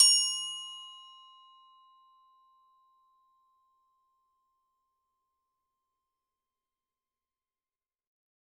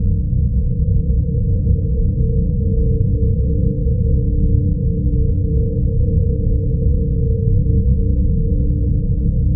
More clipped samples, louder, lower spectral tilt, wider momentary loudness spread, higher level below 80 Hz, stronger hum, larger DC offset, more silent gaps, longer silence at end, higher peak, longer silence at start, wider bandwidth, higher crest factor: neither; second, -27 LUFS vs -18 LUFS; second, 8 dB/octave vs -19 dB/octave; first, 27 LU vs 2 LU; second, under -90 dBFS vs -18 dBFS; first, 60 Hz at -110 dBFS vs none; neither; neither; first, 7.55 s vs 0 s; second, -8 dBFS vs -4 dBFS; about the same, 0 s vs 0 s; first, 18 kHz vs 0.7 kHz; first, 28 dB vs 12 dB